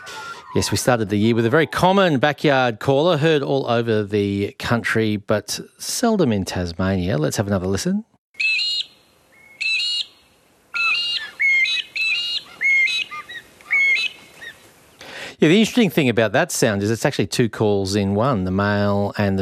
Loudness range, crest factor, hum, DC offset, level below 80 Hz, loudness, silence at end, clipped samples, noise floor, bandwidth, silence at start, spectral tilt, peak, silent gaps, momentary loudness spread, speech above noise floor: 4 LU; 18 dB; none; under 0.1%; -56 dBFS; -19 LUFS; 0 s; under 0.1%; -56 dBFS; 14.5 kHz; 0 s; -4.5 dB/octave; -2 dBFS; 8.18-8.34 s; 11 LU; 37 dB